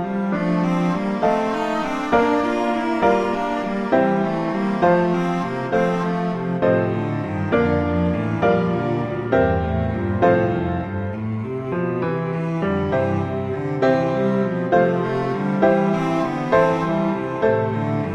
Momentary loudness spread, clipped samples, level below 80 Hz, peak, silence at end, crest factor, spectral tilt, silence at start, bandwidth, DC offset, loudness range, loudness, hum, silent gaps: 6 LU; under 0.1%; -44 dBFS; -4 dBFS; 0 s; 16 dB; -8 dB/octave; 0 s; 9.6 kHz; under 0.1%; 3 LU; -20 LUFS; none; none